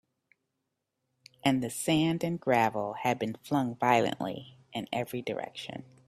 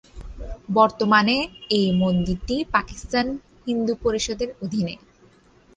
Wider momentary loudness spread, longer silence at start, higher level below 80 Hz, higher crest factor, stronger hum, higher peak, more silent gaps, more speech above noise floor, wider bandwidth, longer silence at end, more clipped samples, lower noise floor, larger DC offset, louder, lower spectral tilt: about the same, 13 LU vs 15 LU; first, 1.45 s vs 0.15 s; second, -68 dBFS vs -42 dBFS; about the same, 22 dB vs 20 dB; neither; second, -10 dBFS vs -2 dBFS; neither; first, 53 dB vs 33 dB; first, 15.5 kHz vs 9.6 kHz; second, 0.25 s vs 0.8 s; neither; first, -83 dBFS vs -54 dBFS; neither; second, -30 LUFS vs -22 LUFS; about the same, -5 dB/octave vs -5 dB/octave